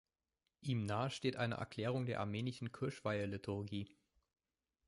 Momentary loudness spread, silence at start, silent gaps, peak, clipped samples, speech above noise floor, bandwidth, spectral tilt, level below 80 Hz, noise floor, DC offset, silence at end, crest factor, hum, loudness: 6 LU; 0.6 s; none; -24 dBFS; under 0.1%; over 49 dB; 11.5 kHz; -6.5 dB/octave; -68 dBFS; under -90 dBFS; under 0.1%; 1 s; 18 dB; none; -42 LUFS